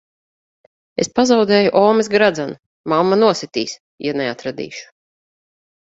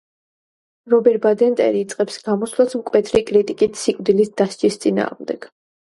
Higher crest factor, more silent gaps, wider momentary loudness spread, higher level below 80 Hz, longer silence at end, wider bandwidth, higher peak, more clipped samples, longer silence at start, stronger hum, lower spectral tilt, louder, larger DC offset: about the same, 18 dB vs 18 dB; first, 2.66-2.84 s, 3.80-3.98 s vs none; first, 16 LU vs 7 LU; about the same, -60 dBFS vs -56 dBFS; first, 1.1 s vs 0.45 s; second, 8 kHz vs 11.5 kHz; about the same, 0 dBFS vs -2 dBFS; neither; first, 1 s vs 0.85 s; neither; about the same, -4.5 dB/octave vs -5.5 dB/octave; about the same, -16 LUFS vs -18 LUFS; neither